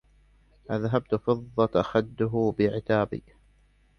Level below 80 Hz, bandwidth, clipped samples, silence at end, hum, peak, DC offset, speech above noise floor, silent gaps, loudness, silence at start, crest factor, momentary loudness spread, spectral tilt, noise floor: -54 dBFS; 6.6 kHz; under 0.1%; 0.8 s; 50 Hz at -55 dBFS; -8 dBFS; under 0.1%; 36 dB; none; -27 LUFS; 0.7 s; 18 dB; 7 LU; -8.5 dB/octave; -62 dBFS